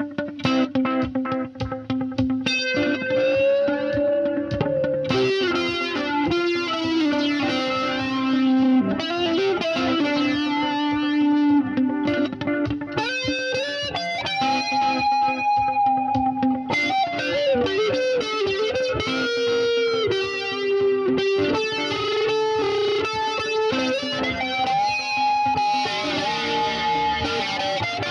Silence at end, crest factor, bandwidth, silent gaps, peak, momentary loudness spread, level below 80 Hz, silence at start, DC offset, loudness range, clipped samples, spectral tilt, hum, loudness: 0 s; 16 dB; 9.8 kHz; none; -6 dBFS; 4 LU; -50 dBFS; 0 s; under 0.1%; 1 LU; under 0.1%; -5 dB/octave; none; -22 LUFS